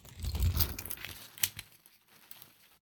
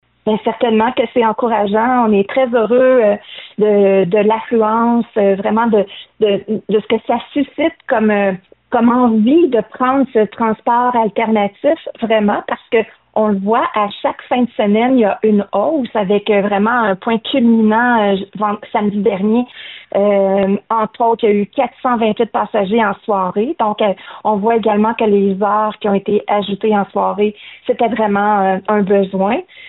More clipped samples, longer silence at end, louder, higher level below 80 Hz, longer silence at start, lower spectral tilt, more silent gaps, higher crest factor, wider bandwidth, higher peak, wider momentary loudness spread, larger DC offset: neither; first, 0.4 s vs 0 s; second, -34 LUFS vs -15 LUFS; first, -42 dBFS vs -56 dBFS; second, 0.05 s vs 0.25 s; second, -3 dB/octave vs -5 dB/octave; neither; first, 30 dB vs 12 dB; first, 19 kHz vs 4.1 kHz; second, -8 dBFS vs -4 dBFS; first, 21 LU vs 6 LU; neither